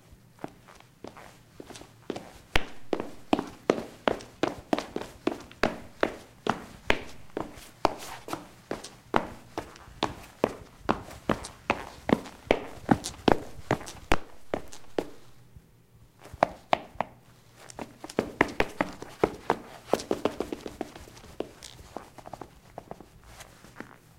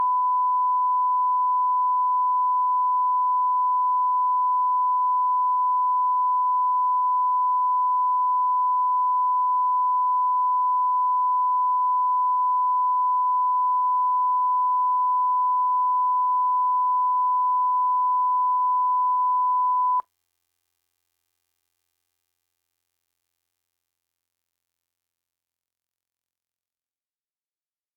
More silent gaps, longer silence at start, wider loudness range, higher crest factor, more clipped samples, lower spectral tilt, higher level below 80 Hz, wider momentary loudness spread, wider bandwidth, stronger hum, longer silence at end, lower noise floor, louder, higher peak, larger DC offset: neither; about the same, 0.1 s vs 0 s; first, 6 LU vs 2 LU; first, 30 dB vs 4 dB; neither; first, -5 dB/octave vs -1.5 dB/octave; first, -48 dBFS vs under -90 dBFS; first, 18 LU vs 0 LU; first, 16.5 kHz vs 1.3 kHz; neither; second, 0.3 s vs 7.95 s; second, -57 dBFS vs under -90 dBFS; second, -32 LUFS vs -21 LUFS; first, -2 dBFS vs -18 dBFS; neither